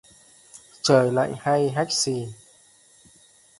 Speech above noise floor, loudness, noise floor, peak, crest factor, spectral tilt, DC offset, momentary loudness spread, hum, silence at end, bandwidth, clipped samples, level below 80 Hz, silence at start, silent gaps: 34 dB; -22 LUFS; -56 dBFS; -4 dBFS; 22 dB; -4 dB/octave; under 0.1%; 10 LU; none; 1.25 s; 11.5 kHz; under 0.1%; -64 dBFS; 0.55 s; none